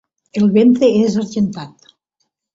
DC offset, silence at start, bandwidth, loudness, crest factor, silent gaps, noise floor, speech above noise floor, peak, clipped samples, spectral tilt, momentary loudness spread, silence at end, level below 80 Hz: under 0.1%; 0.35 s; 7.8 kHz; -14 LUFS; 14 dB; none; -71 dBFS; 58 dB; -2 dBFS; under 0.1%; -7 dB/octave; 17 LU; 0.85 s; -56 dBFS